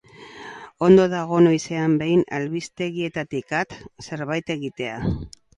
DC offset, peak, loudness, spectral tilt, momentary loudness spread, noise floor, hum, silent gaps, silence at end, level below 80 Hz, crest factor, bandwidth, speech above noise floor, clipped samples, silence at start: under 0.1%; -2 dBFS; -22 LUFS; -6.5 dB/octave; 19 LU; -41 dBFS; none; none; 0.3 s; -48 dBFS; 20 dB; 10.5 kHz; 20 dB; under 0.1%; 0.2 s